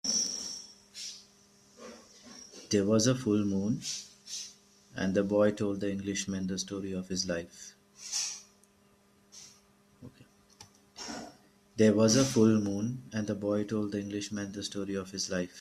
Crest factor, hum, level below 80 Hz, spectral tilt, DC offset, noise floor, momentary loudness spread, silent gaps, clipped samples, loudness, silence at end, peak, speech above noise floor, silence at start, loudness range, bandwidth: 20 dB; none; -68 dBFS; -4.5 dB/octave; under 0.1%; -65 dBFS; 24 LU; none; under 0.1%; -31 LUFS; 0 s; -12 dBFS; 35 dB; 0.05 s; 13 LU; 14 kHz